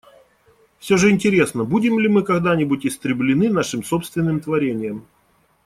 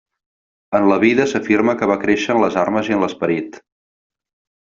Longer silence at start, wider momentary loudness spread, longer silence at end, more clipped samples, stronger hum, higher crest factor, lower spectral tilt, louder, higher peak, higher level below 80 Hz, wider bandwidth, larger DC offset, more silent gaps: first, 0.85 s vs 0.7 s; about the same, 8 LU vs 7 LU; second, 0.65 s vs 1.05 s; neither; neither; about the same, 16 dB vs 18 dB; about the same, -6 dB/octave vs -6 dB/octave; about the same, -19 LUFS vs -17 LUFS; about the same, -2 dBFS vs 0 dBFS; about the same, -54 dBFS vs -56 dBFS; first, 15 kHz vs 7.6 kHz; neither; neither